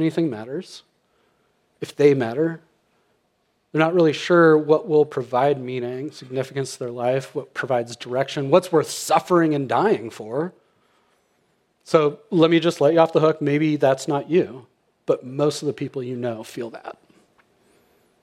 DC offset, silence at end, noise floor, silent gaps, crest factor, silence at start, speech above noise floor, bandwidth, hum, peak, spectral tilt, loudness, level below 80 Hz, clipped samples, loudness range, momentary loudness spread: under 0.1%; 1.3 s; -68 dBFS; none; 20 dB; 0 s; 48 dB; 14.5 kHz; none; -2 dBFS; -6 dB/octave; -21 LUFS; -76 dBFS; under 0.1%; 6 LU; 14 LU